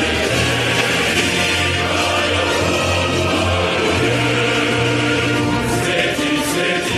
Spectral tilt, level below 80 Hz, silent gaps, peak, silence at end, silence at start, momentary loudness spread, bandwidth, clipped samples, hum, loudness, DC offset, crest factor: -4 dB/octave; -38 dBFS; none; -4 dBFS; 0 s; 0 s; 2 LU; 15.5 kHz; under 0.1%; none; -16 LUFS; under 0.1%; 12 dB